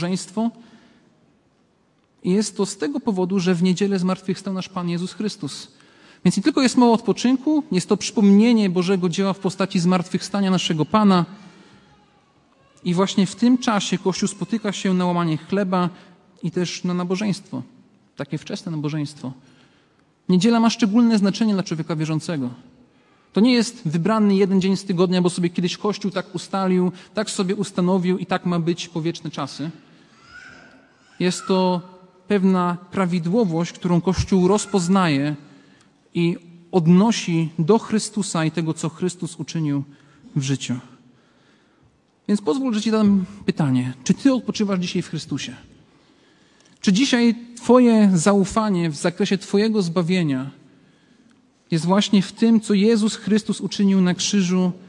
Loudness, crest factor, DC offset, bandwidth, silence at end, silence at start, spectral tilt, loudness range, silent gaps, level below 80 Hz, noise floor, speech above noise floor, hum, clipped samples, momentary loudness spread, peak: -20 LUFS; 18 dB; under 0.1%; 11.5 kHz; 0.1 s; 0 s; -6 dB/octave; 8 LU; none; -54 dBFS; -62 dBFS; 42 dB; none; under 0.1%; 11 LU; -2 dBFS